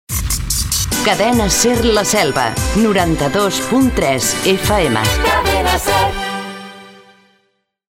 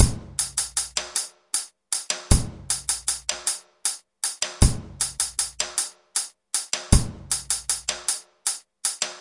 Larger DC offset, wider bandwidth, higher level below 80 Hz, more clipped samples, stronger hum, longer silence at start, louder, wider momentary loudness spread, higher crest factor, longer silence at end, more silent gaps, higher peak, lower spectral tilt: neither; first, 16.5 kHz vs 11.5 kHz; about the same, -28 dBFS vs -32 dBFS; neither; neither; about the same, 0.1 s vs 0 s; first, -14 LUFS vs -25 LUFS; about the same, 6 LU vs 6 LU; second, 14 dB vs 26 dB; first, 1 s vs 0 s; neither; about the same, 0 dBFS vs 0 dBFS; about the same, -3.5 dB/octave vs -2.5 dB/octave